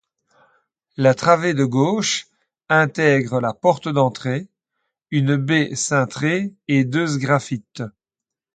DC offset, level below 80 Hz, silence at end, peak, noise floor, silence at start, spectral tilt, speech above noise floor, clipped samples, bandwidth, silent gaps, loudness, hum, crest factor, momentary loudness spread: under 0.1%; -62 dBFS; 0.65 s; 0 dBFS; -87 dBFS; 1 s; -5 dB/octave; 68 dB; under 0.1%; 9.4 kHz; none; -19 LUFS; none; 20 dB; 10 LU